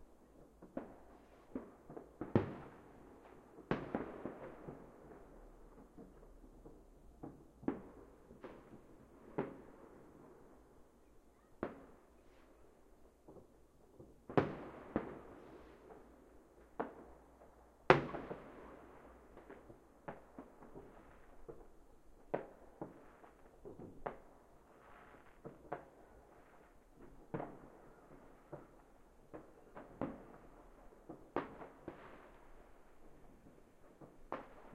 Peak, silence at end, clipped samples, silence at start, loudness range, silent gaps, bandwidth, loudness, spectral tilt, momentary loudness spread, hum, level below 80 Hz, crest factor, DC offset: -4 dBFS; 0 s; under 0.1%; 0 s; 16 LU; none; 15 kHz; -45 LUFS; -7.5 dB/octave; 20 LU; none; -66 dBFS; 44 dB; under 0.1%